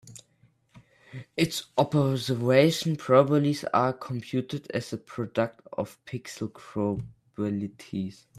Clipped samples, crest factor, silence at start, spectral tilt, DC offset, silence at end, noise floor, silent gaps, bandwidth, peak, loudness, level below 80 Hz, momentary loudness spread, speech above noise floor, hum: under 0.1%; 22 dB; 0.05 s; -6 dB/octave; under 0.1%; 0.25 s; -65 dBFS; none; 14.5 kHz; -6 dBFS; -27 LUFS; -64 dBFS; 16 LU; 38 dB; none